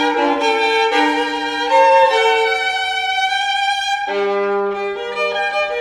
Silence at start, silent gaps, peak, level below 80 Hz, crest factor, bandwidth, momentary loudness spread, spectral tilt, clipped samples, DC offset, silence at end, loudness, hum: 0 s; none; -2 dBFS; -56 dBFS; 14 dB; 15 kHz; 8 LU; -2 dB/octave; under 0.1%; under 0.1%; 0 s; -16 LUFS; none